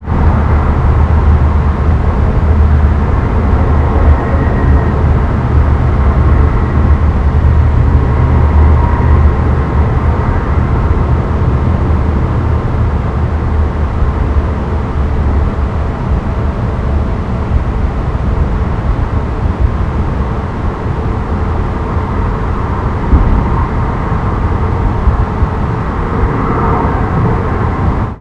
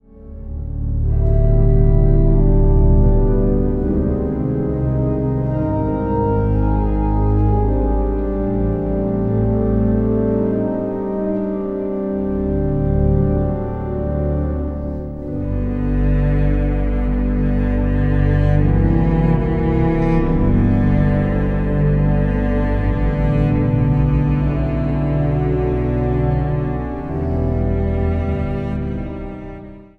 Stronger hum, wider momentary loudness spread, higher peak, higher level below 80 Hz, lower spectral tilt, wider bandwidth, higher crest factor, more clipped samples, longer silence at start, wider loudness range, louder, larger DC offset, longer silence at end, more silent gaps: neither; about the same, 6 LU vs 7 LU; about the same, 0 dBFS vs -2 dBFS; first, -14 dBFS vs -20 dBFS; second, -9.5 dB/octave vs -11.5 dB/octave; first, 5.2 kHz vs 4.2 kHz; about the same, 10 dB vs 14 dB; first, 0.3% vs under 0.1%; second, 0 s vs 0.15 s; about the same, 5 LU vs 4 LU; first, -13 LUFS vs -18 LUFS; neither; second, 0 s vs 0.15 s; neither